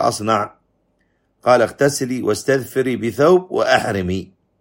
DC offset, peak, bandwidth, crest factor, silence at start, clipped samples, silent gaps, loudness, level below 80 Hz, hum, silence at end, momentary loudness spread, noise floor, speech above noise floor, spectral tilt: under 0.1%; 0 dBFS; 16.5 kHz; 18 dB; 0 s; under 0.1%; none; -18 LUFS; -54 dBFS; none; 0.35 s; 8 LU; -64 dBFS; 47 dB; -5 dB/octave